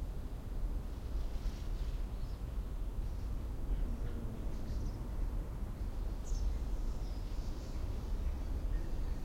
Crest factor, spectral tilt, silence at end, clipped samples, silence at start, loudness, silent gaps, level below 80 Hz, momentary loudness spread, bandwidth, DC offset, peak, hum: 12 dB; -7 dB/octave; 0 s; under 0.1%; 0 s; -43 LUFS; none; -38 dBFS; 3 LU; 15.5 kHz; under 0.1%; -24 dBFS; none